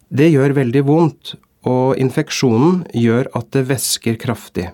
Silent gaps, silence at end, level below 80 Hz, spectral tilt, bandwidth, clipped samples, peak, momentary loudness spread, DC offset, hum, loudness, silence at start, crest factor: none; 0 s; -54 dBFS; -6 dB/octave; 18 kHz; under 0.1%; 0 dBFS; 9 LU; under 0.1%; none; -16 LUFS; 0.1 s; 14 dB